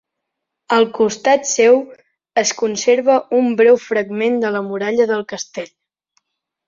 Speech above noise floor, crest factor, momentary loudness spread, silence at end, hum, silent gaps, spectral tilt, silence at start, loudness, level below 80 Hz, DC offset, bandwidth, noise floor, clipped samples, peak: 63 dB; 16 dB; 13 LU; 1.05 s; none; none; -3 dB/octave; 0.7 s; -16 LUFS; -66 dBFS; under 0.1%; 7.6 kHz; -79 dBFS; under 0.1%; -2 dBFS